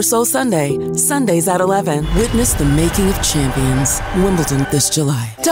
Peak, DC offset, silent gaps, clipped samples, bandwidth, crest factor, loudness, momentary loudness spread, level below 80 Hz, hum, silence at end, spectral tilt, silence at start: -4 dBFS; under 0.1%; none; under 0.1%; 16.5 kHz; 10 dB; -15 LUFS; 3 LU; -26 dBFS; none; 0 s; -4.5 dB/octave; 0 s